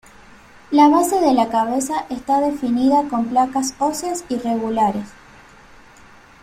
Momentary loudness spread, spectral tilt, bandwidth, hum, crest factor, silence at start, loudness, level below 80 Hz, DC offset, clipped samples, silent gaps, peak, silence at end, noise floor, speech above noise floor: 10 LU; -4.5 dB/octave; 16 kHz; none; 18 dB; 0.7 s; -18 LUFS; -52 dBFS; under 0.1%; under 0.1%; none; -2 dBFS; 1.3 s; -46 dBFS; 28 dB